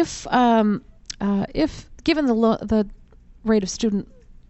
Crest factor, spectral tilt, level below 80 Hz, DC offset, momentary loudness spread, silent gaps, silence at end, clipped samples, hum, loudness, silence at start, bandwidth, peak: 16 dB; -5.5 dB/octave; -42 dBFS; under 0.1%; 11 LU; none; 0.45 s; under 0.1%; none; -22 LUFS; 0 s; 8.2 kHz; -6 dBFS